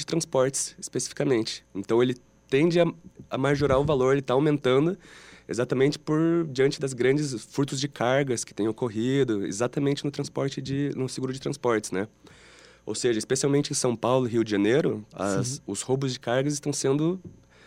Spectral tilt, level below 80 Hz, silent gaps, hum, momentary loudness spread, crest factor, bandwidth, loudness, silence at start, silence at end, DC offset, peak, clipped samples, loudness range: -5 dB/octave; -56 dBFS; none; none; 8 LU; 18 dB; 15.5 kHz; -26 LUFS; 0 s; 0.35 s; under 0.1%; -8 dBFS; under 0.1%; 4 LU